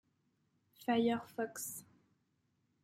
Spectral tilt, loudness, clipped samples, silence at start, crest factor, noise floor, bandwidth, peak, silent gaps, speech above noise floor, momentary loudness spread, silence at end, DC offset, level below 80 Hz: -4 dB/octave; -38 LUFS; under 0.1%; 0.8 s; 20 dB; -80 dBFS; 16.5 kHz; -22 dBFS; none; 43 dB; 11 LU; 1 s; under 0.1%; -82 dBFS